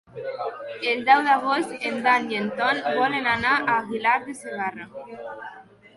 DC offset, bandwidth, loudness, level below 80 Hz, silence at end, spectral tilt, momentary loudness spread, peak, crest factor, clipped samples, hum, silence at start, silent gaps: under 0.1%; 11.5 kHz; -23 LUFS; -62 dBFS; 0.35 s; -4 dB/octave; 19 LU; -4 dBFS; 20 dB; under 0.1%; none; 0.15 s; none